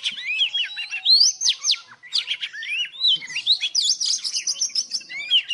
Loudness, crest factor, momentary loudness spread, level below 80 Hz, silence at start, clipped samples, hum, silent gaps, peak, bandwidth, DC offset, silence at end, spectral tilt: -20 LUFS; 16 dB; 11 LU; -80 dBFS; 0 s; under 0.1%; none; none; -6 dBFS; 15 kHz; under 0.1%; 0 s; 5 dB/octave